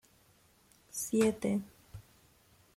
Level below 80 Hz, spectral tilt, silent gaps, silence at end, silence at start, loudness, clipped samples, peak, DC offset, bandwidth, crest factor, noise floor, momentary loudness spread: -66 dBFS; -5 dB/octave; none; 0.75 s; 0.95 s; -33 LUFS; under 0.1%; -16 dBFS; under 0.1%; 16.5 kHz; 20 dB; -66 dBFS; 24 LU